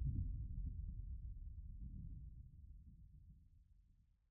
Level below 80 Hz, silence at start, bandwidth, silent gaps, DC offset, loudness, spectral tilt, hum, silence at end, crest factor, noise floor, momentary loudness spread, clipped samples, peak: -50 dBFS; 0 s; 0.5 kHz; none; under 0.1%; -52 LUFS; -21.5 dB/octave; none; 0.3 s; 18 dB; -73 dBFS; 17 LU; under 0.1%; -30 dBFS